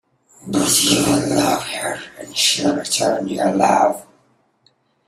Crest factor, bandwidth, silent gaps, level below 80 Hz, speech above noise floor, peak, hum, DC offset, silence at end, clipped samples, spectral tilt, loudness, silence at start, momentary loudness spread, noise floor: 18 dB; 16 kHz; none; -54 dBFS; 43 dB; -2 dBFS; none; under 0.1%; 1.05 s; under 0.1%; -3 dB/octave; -17 LUFS; 0.45 s; 11 LU; -61 dBFS